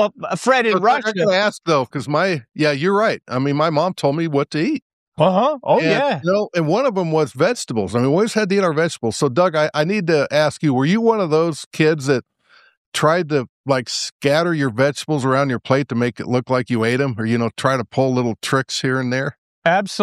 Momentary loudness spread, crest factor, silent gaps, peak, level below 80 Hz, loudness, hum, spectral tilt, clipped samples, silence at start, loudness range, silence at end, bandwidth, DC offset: 5 LU; 16 dB; 4.82-5.12 s, 11.66-11.71 s, 12.77-12.92 s, 13.49-13.64 s, 14.12-14.20 s, 19.38-19.62 s; -2 dBFS; -62 dBFS; -18 LUFS; none; -5.5 dB/octave; under 0.1%; 0 s; 2 LU; 0 s; 14 kHz; under 0.1%